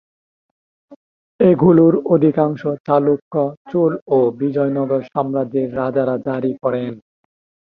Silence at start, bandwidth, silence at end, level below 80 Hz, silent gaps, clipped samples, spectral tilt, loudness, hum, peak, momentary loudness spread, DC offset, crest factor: 0.9 s; 5 kHz; 0.75 s; -56 dBFS; 0.96-1.39 s, 2.80-2.85 s, 3.22-3.31 s, 3.57-3.65 s, 4.02-4.06 s; under 0.1%; -11.5 dB/octave; -17 LUFS; none; 0 dBFS; 9 LU; under 0.1%; 16 dB